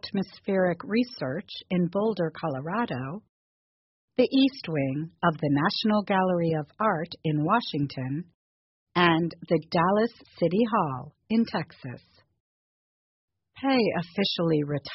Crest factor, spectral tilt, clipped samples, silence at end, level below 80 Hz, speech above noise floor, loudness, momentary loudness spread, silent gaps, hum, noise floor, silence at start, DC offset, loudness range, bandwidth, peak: 20 dB; -5 dB/octave; under 0.1%; 0 s; -64 dBFS; over 64 dB; -27 LUFS; 9 LU; 3.29-4.08 s, 8.34-8.86 s, 12.40-13.28 s; none; under -90 dBFS; 0.05 s; under 0.1%; 4 LU; 6 kHz; -8 dBFS